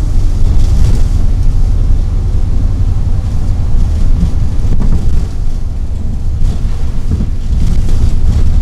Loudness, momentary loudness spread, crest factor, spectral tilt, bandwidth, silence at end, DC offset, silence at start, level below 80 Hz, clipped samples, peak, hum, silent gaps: -15 LUFS; 6 LU; 8 dB; -7.5 dB/octave; 7.8 kHz; 0 s; under 0.1%; 0 s; -10 dBFS; 0.5%; 0 dBFS; none; none